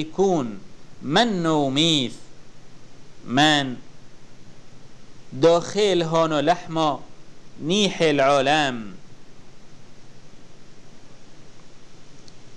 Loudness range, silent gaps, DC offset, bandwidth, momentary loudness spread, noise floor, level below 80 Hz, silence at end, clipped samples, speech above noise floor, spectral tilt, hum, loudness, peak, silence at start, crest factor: 5 LU; none; 1%; 12 kHz; 16 LU; -43 dBFS; -50 dBFS; 0 s; under 0.1%; 22 dB; -4.5 dB/octave; none; -20 LUFS; -6 dBFS; 0 s; 18 dB